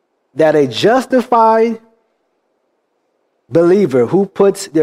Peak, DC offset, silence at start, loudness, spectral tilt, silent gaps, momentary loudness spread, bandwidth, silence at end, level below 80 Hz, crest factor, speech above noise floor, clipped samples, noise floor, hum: -2 dBFS; under 0.1%; 0.35 s; -12 LUFS; -6 dB/octave; none; 7 LU; 15 kHz; 0 s; -60 dBFS; 12 dB; 53 dB; under 0.1%; -65 dBFS; none